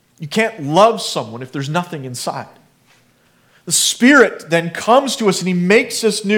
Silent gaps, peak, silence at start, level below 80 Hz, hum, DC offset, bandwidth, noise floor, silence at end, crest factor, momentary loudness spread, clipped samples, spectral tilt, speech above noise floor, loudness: none; 0 dBFS; 0.2 s; -64 dBFS; none; under 0.1%; 19 kHz; -55 dBFS; 0 s; 16 dB; 14 LU; under 0.1%; -3.5 dB/octave; 40 dB; -15 LUFS